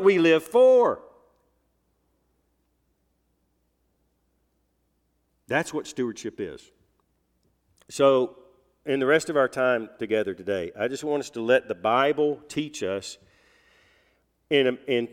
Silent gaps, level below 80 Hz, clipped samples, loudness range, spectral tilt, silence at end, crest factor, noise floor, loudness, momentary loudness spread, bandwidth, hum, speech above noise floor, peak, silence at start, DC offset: none; -68 dBFS; under 0.1%; 9 LU; -4.5 dB/octave; 0.05 s; 20 dB; -72 dBFS; -24 LUFS; 15 LU; 15 kHz; none; 48 dB; -6 dBFS; 0 s; under 0.1%